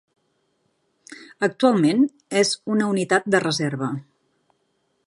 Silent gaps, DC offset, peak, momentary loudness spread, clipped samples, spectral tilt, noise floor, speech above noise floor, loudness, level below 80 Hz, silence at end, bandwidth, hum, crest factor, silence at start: none; under 0.1%; -2 dBFS; 11 LU; under 0.1%; -4.5 dB/octave; -70 dBFS; 49 dB; -21 LUFS; -70 dBFS; 1.05 s; 11.5 kHz; none; 20 dB; 1.1 s